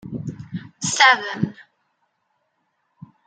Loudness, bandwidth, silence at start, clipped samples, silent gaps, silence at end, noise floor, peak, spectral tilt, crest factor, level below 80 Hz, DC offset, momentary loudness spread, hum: -18 LUFS; 10 kHz; 0.05 s; under 0.1%; none; 1.65 s; -71 dBFS; 0 dBFS; -2.5 dB/octave; 24 dB; -64 dBFS; under 0.1%; 19 LU; none